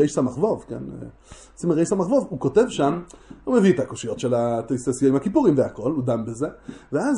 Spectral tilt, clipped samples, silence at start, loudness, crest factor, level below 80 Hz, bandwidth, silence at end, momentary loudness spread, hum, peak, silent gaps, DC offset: -6.5 dB/octave; under 0.1%; 0 s; -22 LUFS; 16 dB; -52 dBFS; 11 kHz; 0 s; 14 LU; none; -6 dBFS; none; under 0.1%